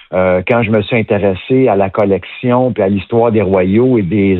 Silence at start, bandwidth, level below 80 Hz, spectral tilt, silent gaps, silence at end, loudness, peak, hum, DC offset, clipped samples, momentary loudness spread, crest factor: 0.1 s; 4.2 kHz; -50 dBFS; -10.5 dB/octave; none; 0 s; -12 LUFS; 0 dBFS; none; under 0.1%; under 0.1%; 4 LU; 12 dB